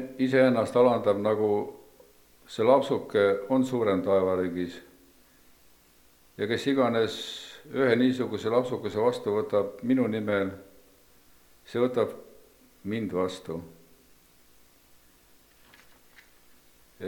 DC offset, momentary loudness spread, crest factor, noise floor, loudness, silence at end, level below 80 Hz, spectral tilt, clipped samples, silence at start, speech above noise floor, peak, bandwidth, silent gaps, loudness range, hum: under 0.1%; 14 LU; 20 dB; -59 dBFS; -26 LUFS; 0 s; -68 dBFS; -6.5 dB/octave; under 0.1%; 0 s; 34 dB; -8 dBFS; 19 kHz; none; 11 LU; 60 Hz at -65 dBFS